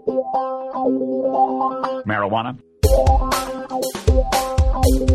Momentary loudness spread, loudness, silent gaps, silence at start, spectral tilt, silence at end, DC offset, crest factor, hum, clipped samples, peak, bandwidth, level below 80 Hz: 8 LU; -20 LUFS; none; 0.05 s; -6 dB/octave; 0 s; under 0.1%; 16 dB; none; under 0.1%; -2 dBFS; 15.5 kHz; -24 dBFS